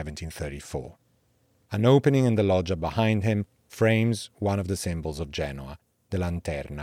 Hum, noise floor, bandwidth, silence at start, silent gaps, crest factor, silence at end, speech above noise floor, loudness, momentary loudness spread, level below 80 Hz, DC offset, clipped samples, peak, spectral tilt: none; -67 dBFS; 15.5 kHz; 0 s; none; 18 dB; 0 s; 41 dB; -26 LUFS; 15 LU; -48 dBFS; under 0.1%; under 0.1%; -8 dBFS; -6.5 dB/octave